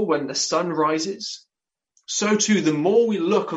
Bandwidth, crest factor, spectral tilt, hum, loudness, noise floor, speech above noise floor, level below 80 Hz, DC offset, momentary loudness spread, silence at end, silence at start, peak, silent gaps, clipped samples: 8.4 kHz; 16 dB; -3.5 dB/octave; none; -21 LUFS; -69 dBFS; 48 dB; -70 dBFS; under 0.1%; 10 LU; 0 s; 0 s; -6 dBFS; none; under 0.1%